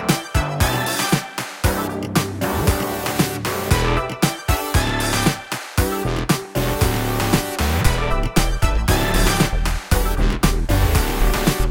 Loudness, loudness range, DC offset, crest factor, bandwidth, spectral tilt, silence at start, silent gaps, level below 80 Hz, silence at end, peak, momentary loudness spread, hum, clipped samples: -20 LUFS; 2 LU; under 0.1%; 18 dB; 17 kHz; -4.5 dB/octave; 0 s; none; -24 dBFS; 0 s; -2 dBFS; 4 LU; none; under 0.1%